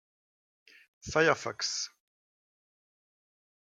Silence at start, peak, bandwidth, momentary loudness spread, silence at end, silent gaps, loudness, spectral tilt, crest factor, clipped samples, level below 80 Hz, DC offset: 1.05 s; -10 dBFS; 11 kHz; 13 LU; 1.8 s; none; -30 LUFS; -2.5 dB/octave; 26 dB; under 0.1%; -66 dBFS; under 0.1%